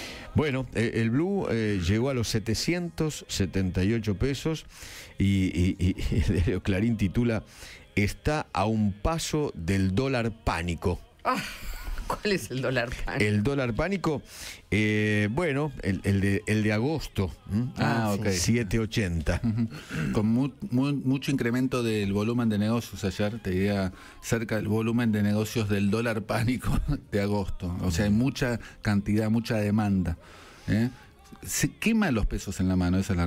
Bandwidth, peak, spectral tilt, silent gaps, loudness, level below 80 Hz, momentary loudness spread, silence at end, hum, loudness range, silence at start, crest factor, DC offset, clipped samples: 16 kHz; -10 dBFS; -6 dB/octave; none; -27 LUFS; -40 dBFS; 6 LU; 0 s; none; 2 LU; 0 s; 16 dB; under 0.1%; under 0.1%